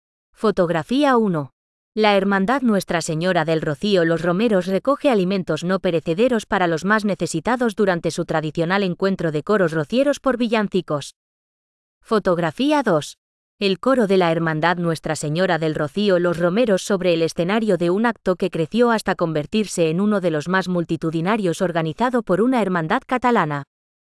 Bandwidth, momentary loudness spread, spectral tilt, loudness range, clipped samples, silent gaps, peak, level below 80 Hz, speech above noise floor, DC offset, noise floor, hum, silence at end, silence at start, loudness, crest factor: 12 kHz; 5 LU; -6 dB/octave; 2 LU; under 0.1%; 1.53-1.92 s, 11.16-12.01 s, 13.18-13.58 s; -4 dBFS; -54 dBFS; over 71 dB; under 0.1%; under -90 dBFS; none; 0.4 s; 0.4 s; -20 LUFS; 16 dB